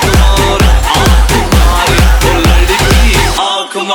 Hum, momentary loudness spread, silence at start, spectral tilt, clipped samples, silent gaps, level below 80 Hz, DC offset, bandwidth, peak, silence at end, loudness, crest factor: none; 2 LU; 0 s; -4 dB/octave; under 0.1%; none; -10 dBFS; under 0.1%; 19 kHz; 0 dBFS; 0 s; -9 LUFS; 8 dB